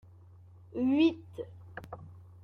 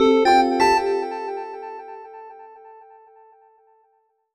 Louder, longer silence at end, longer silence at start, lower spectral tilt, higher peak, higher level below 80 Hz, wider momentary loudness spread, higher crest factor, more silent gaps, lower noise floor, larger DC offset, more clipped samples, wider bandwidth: second, -30 LUFS vs -19 LUFS; second, 0.25 s vs 1.65 s; first, 0.75 s vs 0 s; first, -7.5 dB/octave vs -3.5 dB/octave; second, -16 dBFS vs -6 dBFS; second, -68 dBFS vs -54 dBFS; second, 22 LU vs 25 LU; about the same, 18 dB vs 16 dB; neither; second, -55 dBFS vs -66 dBFS; neither; neither; second, 6.4 kHz vs 13 kHz